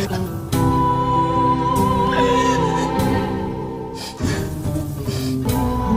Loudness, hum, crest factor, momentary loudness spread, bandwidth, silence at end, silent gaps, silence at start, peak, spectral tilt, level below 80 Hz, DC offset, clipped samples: -20 LUFS; none; 14 dB; 8 LU; 16 kHz; 0 s; none; 0 s; -6 dBFS; -6 dB/octave; -34 dBFS; under 0.1%; under 0.1%